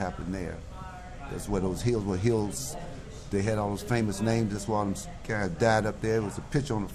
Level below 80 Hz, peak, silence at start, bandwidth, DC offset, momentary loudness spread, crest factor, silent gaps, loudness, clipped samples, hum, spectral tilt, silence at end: -44 dBFS; -12 dBFS; 0 s; 14.5 kHz; under 0.1%; 14 LU; 18 dB; none; -30 LUFS; under 0.1%; none; -6 dB/octave; 0 s